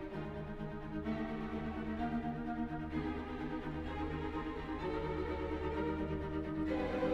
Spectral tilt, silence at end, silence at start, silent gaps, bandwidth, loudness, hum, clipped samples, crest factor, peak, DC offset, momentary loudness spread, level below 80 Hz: -8 dB/octave; 0 s; 0 s; none; 7.8 kHz; -40 LUFS; none; under 0.1%; 16 dB; -24 dBFS; under 0.1%; 5 LU; -48 dBFS